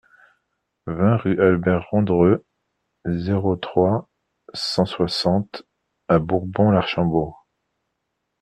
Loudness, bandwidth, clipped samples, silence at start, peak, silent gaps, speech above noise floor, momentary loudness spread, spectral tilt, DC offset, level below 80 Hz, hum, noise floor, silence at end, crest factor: -20 LUFS; 11.5 kHz; under 0.1%; 0.85 s; -4 dBFS; none; 57 dB; 14 LU; -7.5 dB/octave; under 0.1%; -52 dBFS; none; -77 dBFS; 1.05 s; 18 dB